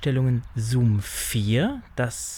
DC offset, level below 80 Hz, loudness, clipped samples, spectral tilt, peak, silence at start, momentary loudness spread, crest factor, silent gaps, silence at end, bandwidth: under 0.1%; -44 dBFS; -24 LUFS; under 0.1%; -5.5 dB/octave; -10 dBFS; 0 s; 6 LU; 12 dB; none; 0 s; 20 kHz